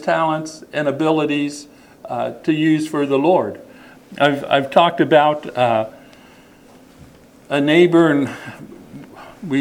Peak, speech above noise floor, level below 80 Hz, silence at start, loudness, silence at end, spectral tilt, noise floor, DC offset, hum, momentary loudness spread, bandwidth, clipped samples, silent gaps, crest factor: 0 dBFS; 29 dB; -60 dBFS; 0 s; -17 LUFS; 0 s; -6 dB/octave; -46 dBFS; under 0.1%; none; 21 LU; 15 kHz; under 0.1%; none; 18 dB